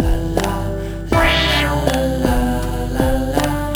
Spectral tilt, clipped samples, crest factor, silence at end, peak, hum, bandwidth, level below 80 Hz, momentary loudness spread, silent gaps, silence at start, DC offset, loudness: -5 dB/octave; under 0.1%; 16 dB; 0 s; 0 dBFS; none; over 20 kHz; -22 dBFS; 8 LU; none; 0 s; under 0.1%; -18 LUFS